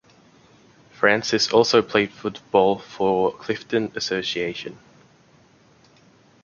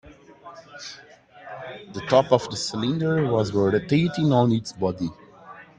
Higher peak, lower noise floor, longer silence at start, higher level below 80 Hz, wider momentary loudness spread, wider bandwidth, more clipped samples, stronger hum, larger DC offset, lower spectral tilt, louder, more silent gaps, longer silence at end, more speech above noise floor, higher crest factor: about the same, -2 dBFS vs -4 dBFS; first, -55 dBFS vs -46 dBFS; first, 1 s vs 0.05 s; about the same, -60 dBFS vs -56 dBFS; second, 11 LU vs 20 LU; second, 7.2 kHz vs 9.8 kHz; neither; neither; neither; second, -4 dB/octave vs -6.5 dB/octave; about the same, -21 LUFS vs -22 LUFS; neither; first, 1.7 s vs 0.15 s; first, 34 dB vs 23 dB; about the same, 22 dB vs 20 dB